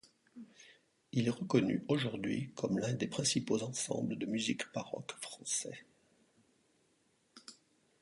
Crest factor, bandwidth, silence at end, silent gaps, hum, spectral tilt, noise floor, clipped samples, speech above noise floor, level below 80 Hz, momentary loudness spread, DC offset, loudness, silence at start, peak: 22 dB; 11.5 kHz; 0.5 s; none; none; -4.5 dB/octave; -75 dBFS; under 0.1%; 39 dB; -74 dBFS; 22 LU; under 0.1%; -36 LUFS; 0.35 s; -16 dBFS